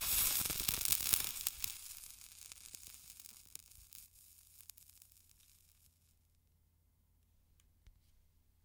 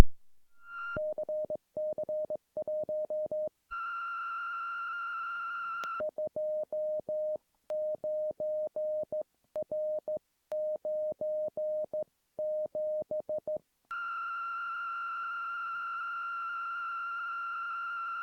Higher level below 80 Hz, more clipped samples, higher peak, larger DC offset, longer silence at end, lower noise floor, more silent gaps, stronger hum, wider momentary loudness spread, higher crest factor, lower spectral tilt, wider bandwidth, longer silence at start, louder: about the same, -62 dBFS vs -60 dBFS; neither; second, -8 dBFS vs -2 dBFS; neither; first, 0.75 s vs 0 s; first, -74 dBFS vs -53 dBFS; neither; neither; first, 24 LU vs 4 LU; about the same, 34 dB vs 32 dB; second, 0.5 dB/octave vs -5.5 dB/octave; first, 19 kHz vs 6.6 kHz; about the same, 0 s vs 0 s; about the same, -34 LUFS vs -36 LUFS